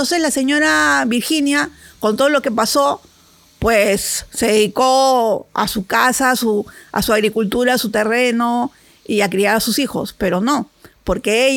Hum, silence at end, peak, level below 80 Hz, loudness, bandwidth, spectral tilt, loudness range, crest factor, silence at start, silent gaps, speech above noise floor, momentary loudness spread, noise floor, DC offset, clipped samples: none; 0 s; -2 dBFS; -42 dBFS; -16 LUFS; 19 kHz; -3 dB/octave; 2 LU; 16 dB; 0 s; none; 34 dB; 8 LU; -50 dBFS; under 0.1%; under 0.1%